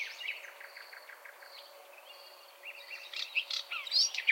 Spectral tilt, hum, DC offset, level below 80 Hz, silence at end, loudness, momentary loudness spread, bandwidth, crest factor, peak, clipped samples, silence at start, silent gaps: 7 dB/octave; none; under 0.1%; under -90 dBFS; 0 s; -33 LUFS; 23 LU; 16.5 kHz; 24 dB; -14 dBFS; under 0.1%; 0 s; none